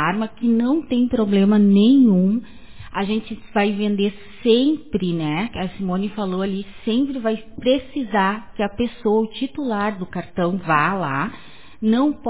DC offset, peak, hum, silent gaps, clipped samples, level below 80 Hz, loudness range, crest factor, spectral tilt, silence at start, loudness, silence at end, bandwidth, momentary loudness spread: 1%; -2 dBFS; none; none; under 0.1%; -48 dBFS; 5 LU; 16 dB; -11 dB/octave; 0 s; -20 LUFS; 0 s; 4 kHz; 11 LU